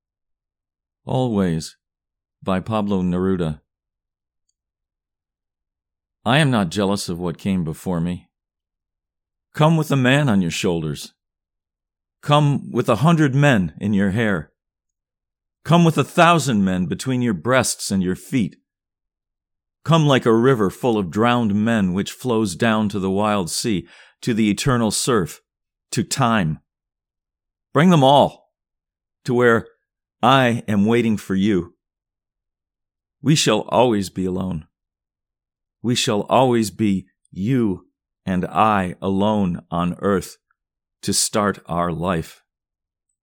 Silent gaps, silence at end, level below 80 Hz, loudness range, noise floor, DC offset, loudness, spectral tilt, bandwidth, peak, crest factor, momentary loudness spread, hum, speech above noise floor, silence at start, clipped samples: none; 0.9 s; -52 dBFS; 5 LU; -87 dBFS; under 0.1%; -19 LUFS; -5.5 dB/octave; 18 kHz; 0 dBFS; 20 dB; 12 LU; none; 69 dB; 1.05 s; under 0.1%